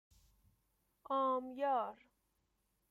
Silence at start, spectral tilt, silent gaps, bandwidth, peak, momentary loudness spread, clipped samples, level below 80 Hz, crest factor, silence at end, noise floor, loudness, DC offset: 1.1 s; -5.5 dB/octave; none; 14 kHz; -26 dBFS; 5 LU; under 0.1%; -78 dBFS; 16 dB; 0.95 s; -82 dBFS; -38 LUFS; under 0.1%